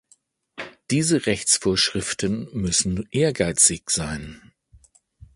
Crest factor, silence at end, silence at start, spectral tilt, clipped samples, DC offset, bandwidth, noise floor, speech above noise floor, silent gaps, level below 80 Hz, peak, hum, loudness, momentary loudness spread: 22 dB; 1 s; 0.55 s; -3 dB/octave; under 0.1%; under 0.1%; 11.5 kHz; -61 dBFS; 39 dB; none; -46 dBFS; -2 dBFS; none; -21 LUFS; 18 LU